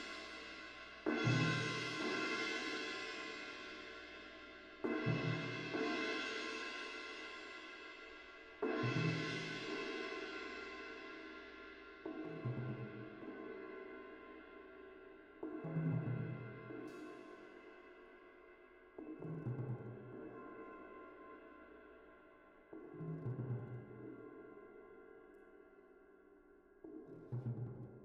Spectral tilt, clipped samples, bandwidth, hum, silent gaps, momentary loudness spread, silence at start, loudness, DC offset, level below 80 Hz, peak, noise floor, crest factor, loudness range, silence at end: -5.5 dB/octave; under 0.1%; 10 kHz; none; none; 20 LU; 0 s; -44 LUFS; under 0.1%; -74 dBFS; -24 dBFS; -66 dBFS; 22 dB; 12 LU; 0 s